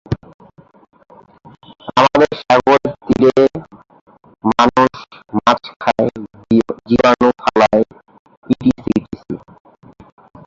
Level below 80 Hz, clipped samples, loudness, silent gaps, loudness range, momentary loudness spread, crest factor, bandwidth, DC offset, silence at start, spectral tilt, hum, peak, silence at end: -46 dBFS; under 0.1%; -15 LUFS; 0.34-0.39 s, 4.01-4.07 s, 5.76-5.80 s, 8.19-8.25 s, 8.37-8.42 s; 2 LU; 16 LU; 16 dB; 7.6 kHz; under 0.1%; 0.1 s; -6 dB/octave; none; 0 dBFS; 1.1 s